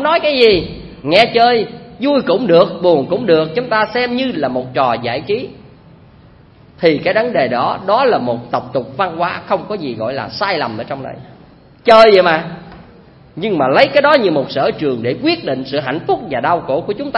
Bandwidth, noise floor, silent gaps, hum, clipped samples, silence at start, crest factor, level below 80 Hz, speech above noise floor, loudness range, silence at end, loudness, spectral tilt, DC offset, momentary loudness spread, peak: 10.5 kHz; -43 dBFS; none; none; under 0.1%; 0 s; 14 dB; -48 dBFS; 29 dB; 6 LU; 0 s; -14 LUFS; -6.5 dB/octave; under 0.1%; 11 LU; 0 dBFS